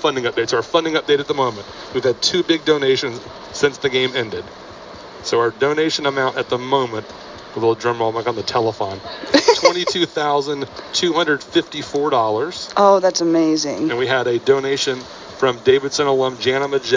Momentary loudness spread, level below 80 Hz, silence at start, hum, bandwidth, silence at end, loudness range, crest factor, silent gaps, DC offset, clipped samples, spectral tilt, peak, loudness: 12 LU; -54 dBFS; 0 s; none; 7.6 kHz; 0 s; 3 LU; 18 dB; none; under 0.1%; under 0.1%; -3.5 dB/octave; 0 dBFS; -18 LUFS